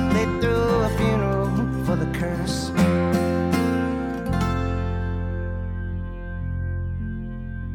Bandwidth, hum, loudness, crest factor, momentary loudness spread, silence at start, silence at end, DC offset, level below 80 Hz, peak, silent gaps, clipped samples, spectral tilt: 17 kHz; none; -24 LUFS; 16 dB; 10 LU; 0 s; 0 s; under 0.1%; -34 dBFS; -8 dBFS; none; under 0.1%; -7 dB/octave